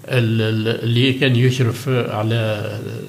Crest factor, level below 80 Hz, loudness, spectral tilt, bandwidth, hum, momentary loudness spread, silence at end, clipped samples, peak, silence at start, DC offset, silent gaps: 14 dB; -66 dBFS; -18 LUFS; -6.5 dB/octave; 15 kHz; none; 6 LU; 0 s; under 0.1%; -2 dBFS; 0 s; under 0.1%; none